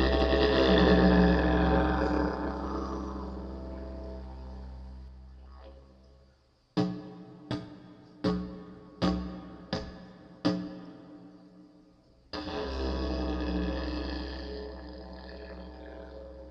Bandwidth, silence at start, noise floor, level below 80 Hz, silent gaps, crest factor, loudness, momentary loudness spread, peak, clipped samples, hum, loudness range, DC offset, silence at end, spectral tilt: 7 kHz; 0 s; -65 dBFS; -38 dBFS; none; 20 dB; -30 LUFS; 25 LU; -10 dBFS; under 0.1%; none; 14 LU; under 0.1%; 0 s; -7.5 dB/octave